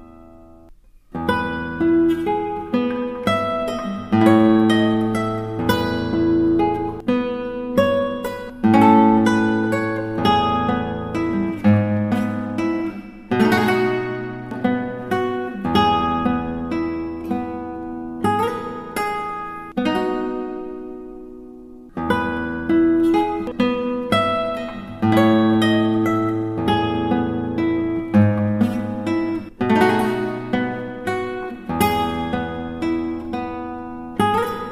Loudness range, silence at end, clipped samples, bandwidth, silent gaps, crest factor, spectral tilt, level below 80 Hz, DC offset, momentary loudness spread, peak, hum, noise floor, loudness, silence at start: 6 LU; 0 s; under 0.1%; 15.5 kHz; none; 18 dB; -7 dB/octave; -46 dBFS; under 0.1%; 12 LU; -2 dBFS; none; -46 dBFS; -20 LUFS; 0 s